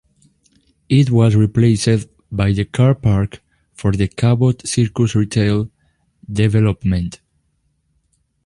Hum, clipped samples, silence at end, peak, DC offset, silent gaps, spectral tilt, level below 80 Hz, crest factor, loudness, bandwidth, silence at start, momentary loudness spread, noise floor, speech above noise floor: none; under 0.1%; 1.3 s; -2 dBFS; under 0.1%; none; -7 dB/octave; -36 dBFS; 14 dB; -16 LUFS; 11 kHz; 0.9 s; 8 LU; -65 dBFS; 50 dB